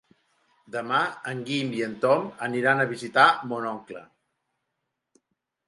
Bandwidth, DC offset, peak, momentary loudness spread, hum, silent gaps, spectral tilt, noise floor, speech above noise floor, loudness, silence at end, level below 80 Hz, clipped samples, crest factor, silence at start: 11.5 kHz; under 0.1%; -4 dBFS; 16 LU; none; none; -5 dB/octave; -81 dBFS; 56 dB; -25 LUFS; 1.65 s; -76 dBFS; under 0.1%; 24 dB; 0.7 s